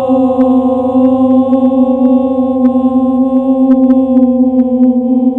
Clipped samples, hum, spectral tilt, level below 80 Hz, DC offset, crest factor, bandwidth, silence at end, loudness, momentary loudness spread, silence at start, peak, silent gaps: 0.2%; none; -10 dB/octave; -44 dBFS; under 0.1%; 8 dB; 3.7 kHz; 0 s; -10 LUFS; 2 LU; 0 s; 0 dBFS; none